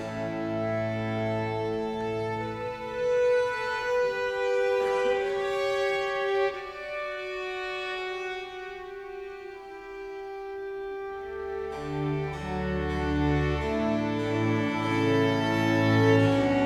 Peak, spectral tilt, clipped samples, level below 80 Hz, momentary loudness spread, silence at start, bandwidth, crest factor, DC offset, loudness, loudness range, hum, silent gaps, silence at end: -10 dBFS; -6.5 dB/octave; under 0.1%; -46 dBFS; 14 LU; 0 s; 12.5 kHz; 18 dB; under 0.1%; -28 LUFS; 10 LU; none; none; 0 s